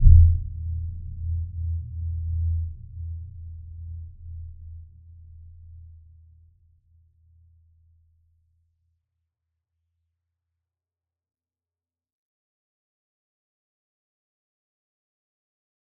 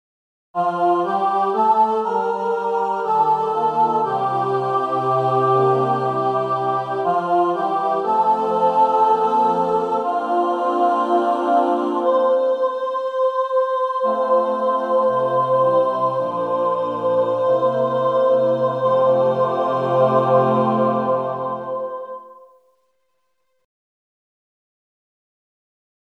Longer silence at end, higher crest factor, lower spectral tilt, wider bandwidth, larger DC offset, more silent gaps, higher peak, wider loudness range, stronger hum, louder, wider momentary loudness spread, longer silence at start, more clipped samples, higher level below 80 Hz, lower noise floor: first, 10.2 s vs 3.85 s; first, 26 dB vs 16 dB; first, -17 dB/octave vs -8 dB/octave; second, 0.4 kHz vs 8.2 kHz; neither; neither; about the same, -2 dBFS vs -4 dBFS; first, 22 LU vs 2 LU; neither; second, -27 LUFS vs -19 LUFS; first, 21 LU vs 5 LU; second, 0 s vs 0.55 s; neither; first, -32 dBFS vs -76 dBFS; first, under -90 dBFS vs -72 dBFS